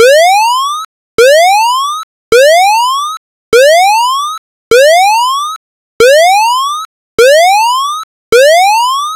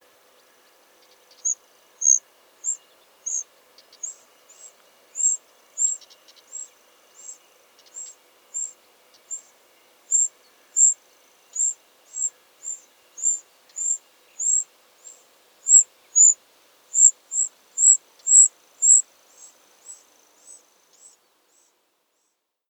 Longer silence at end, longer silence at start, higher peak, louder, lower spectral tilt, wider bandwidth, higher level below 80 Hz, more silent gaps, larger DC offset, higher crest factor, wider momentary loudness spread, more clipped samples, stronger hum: second, 0 s vs 2.75 s; second, 0 s vs 1.45 s; about the same, 0 dBFS vs -2 dBFS; first, -7 LUFS vs -18 LUFS; first, 0 dB/octave vs 4.5 dB/octave; second, 16.5 kHz vs over 20 kHz; first, -48 dBFS vs under -90 dBFS; first, 0.85-1.18 s, 2.03-2.32 s, 3.17-3.52 s, 4.38-4.71 s, 5.56-6.00 s, 6.85-7.18 s, 8.04-8.32 s vs none; neither; second, 8 dB vs 24 dB; second, 14 LU vs 24 LU; neither; neither